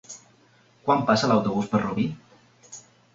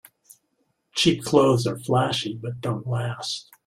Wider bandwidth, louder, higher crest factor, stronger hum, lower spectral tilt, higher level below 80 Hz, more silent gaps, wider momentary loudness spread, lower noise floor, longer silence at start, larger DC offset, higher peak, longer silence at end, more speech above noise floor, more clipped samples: second, 7.8 kHz vs 16 kHz; about the same, -24 LUFS vs -23 LUFS; about the same, 20 dB vs 20 dB; neither; about the same, -5.5 dB/octave vs -5 dB/octave; about the same, -60 dBFS vs -58 dBFS; neither; first, 23 LU vs 12 LU; second, -59 dBFS vs -72 dBFS; second, 0.1 s vs 0.95 s; neither; about the same, -6 dBFS vs -4 dBFS; about the same, 0.35 s vs 0.25 s; second, 36 dB vs 49 dB; neither